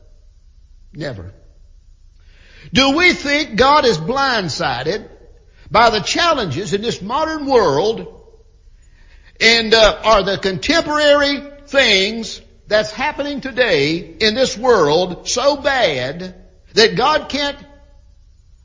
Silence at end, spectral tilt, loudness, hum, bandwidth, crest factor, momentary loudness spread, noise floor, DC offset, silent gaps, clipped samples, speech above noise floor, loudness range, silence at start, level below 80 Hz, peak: 1 s; -3.5 dB/octave; -15 LUFS; none; 7.6 kHz; 18 dB; 14 LU; -47 dBFS; under 0.1%; none; under 0.1%; 31 dB; 4 LU; 0.95 s; -40 dBFS; 0 dBFS